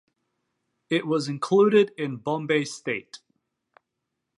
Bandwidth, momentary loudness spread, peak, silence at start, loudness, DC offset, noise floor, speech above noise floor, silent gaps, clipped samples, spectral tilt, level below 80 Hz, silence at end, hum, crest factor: 11 kHz; 12 LU; -8 dBFS; 0.9 s; -24 LUFS; under 0.1%; -82 dBFS; 58 dB; none; under 0.1%; -5.5 dB/octave; -78 dBFS; 1.2 s; none; 18 dB